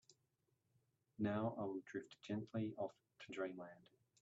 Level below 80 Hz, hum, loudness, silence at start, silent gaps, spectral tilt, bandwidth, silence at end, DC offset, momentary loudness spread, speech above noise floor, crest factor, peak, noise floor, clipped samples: -86 dBFS; none; -47 LUFS; 0.1 s; none; -6.5 dB/octave; 7.6 kHz; 0.45 s; under 0.1%; 14 LU; 39 dB; 18 dB; -28 dBFS; -85 dBFS; under 0.1%